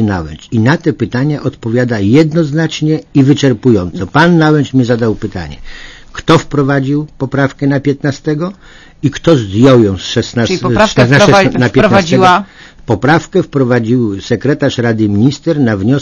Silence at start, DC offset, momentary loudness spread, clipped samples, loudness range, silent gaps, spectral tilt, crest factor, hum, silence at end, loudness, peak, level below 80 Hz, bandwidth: 0 s; under 0.1%; 10 LU; 0.8%; 5 LU; none; -6.5 dB/octave; 10 dB; none; 0 s; -11 LUFS; 0 dBFS; -36 dBFS; 9.4 kHz